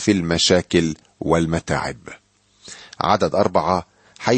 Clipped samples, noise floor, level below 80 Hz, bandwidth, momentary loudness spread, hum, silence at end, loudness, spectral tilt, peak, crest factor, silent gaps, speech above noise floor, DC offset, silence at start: under 0.1%; -47 dBFS; -44 dBFS; 8.8 kHz; 21 LU; none; 0 s; -20 LUFS; -4.5 dB/octave; -2 dBFS; 18 dB; none; 28 dB; under 0.1%; 0 s